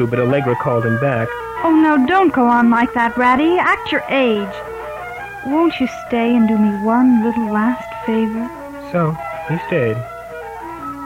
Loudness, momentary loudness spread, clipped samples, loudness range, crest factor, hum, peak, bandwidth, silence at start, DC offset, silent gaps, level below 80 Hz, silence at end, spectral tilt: -16 LUFS; 15 LU; under 0.1%; 6 LU; 14 dB; none; -2 dBFS; 15.5 kHz; 0 s; under 0.1%; none; -48 dBFS; 0 s; -7.5 dB/octave